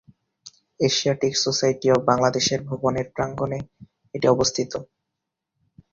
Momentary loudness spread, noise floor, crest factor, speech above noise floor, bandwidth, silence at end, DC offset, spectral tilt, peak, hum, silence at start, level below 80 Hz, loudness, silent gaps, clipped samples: 11 LU; -83 dBFS; 20 dB; 60 dB; 7.6 kHz; 1.1 s; under 0.1%; -4 dB/octave; -4 dBFS; none; 0.45 s; -54 dBFS; -22 LUFS; none; under 0.1%